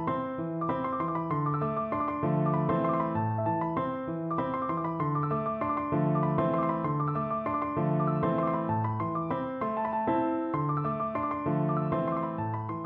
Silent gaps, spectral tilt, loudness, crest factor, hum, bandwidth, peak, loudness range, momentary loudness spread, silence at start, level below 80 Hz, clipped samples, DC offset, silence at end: none; -11.5 dB/octave; -30 LUFS; 14 dB; none; 4.2 kHz; -16 dBFS; 1 LU; 4 LU; 0 s; -60 dBFS; under 0.1%; under 0.1%; 0 s